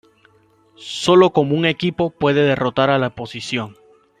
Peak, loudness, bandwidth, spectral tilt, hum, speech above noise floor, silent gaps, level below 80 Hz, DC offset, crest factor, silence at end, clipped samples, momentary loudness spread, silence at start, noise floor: -2 dBFS; -17 LUFS; 10 kHz; -6 dB/octave; none; 38 dB; none; -54 dBFS; under 0.1%; 16 dB; 0.5 s; under 0.1%; 15 LU; 0.8 s; -55 dBFS